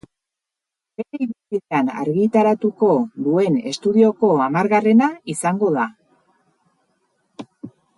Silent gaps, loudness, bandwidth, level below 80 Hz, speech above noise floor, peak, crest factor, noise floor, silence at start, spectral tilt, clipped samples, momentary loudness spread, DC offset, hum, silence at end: none; -18 LUFS; 11.5 kHz; -68 dBFS; 68 dB; -4 dBFS; 16 dB; -85 dBFS; 1 s; -6.5 dB/octave; under 0.1%; 17 LU; under 0.1%; none; 0.3 s